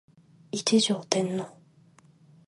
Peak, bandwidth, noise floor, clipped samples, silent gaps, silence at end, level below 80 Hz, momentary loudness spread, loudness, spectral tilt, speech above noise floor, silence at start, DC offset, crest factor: -4 dBFS; 11.5 kHz; -58 dBFS; under 0.1%; none; 1 s; -78 dBFS; 13 LU; -26 LUFS; -4 dB/octave; 32 dB; 0.55 s; under 0.1%; 26 dB